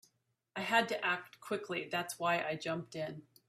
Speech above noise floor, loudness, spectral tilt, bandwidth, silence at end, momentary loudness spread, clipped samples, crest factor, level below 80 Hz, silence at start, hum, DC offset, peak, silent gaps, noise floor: 41 dB; -36 LUFS; -3.5 dB/octave; 15.5 kHz; 0.25 s; 11 LU; under 0.1%; 22 dB; -80 dBFS; 0.55 s; none; under 0.1%; -14 dBFS; none; -77 dBFS